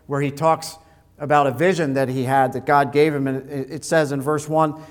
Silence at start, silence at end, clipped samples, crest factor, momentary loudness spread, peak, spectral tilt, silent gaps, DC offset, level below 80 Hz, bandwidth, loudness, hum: 0.1 s; 0 s; under 0.1%; 18 dB; 9 LU; -2 dBFS; -6 dB/octave; none; under 0.1%; -58 dBFS; 19 kHz; -20 LUFS; none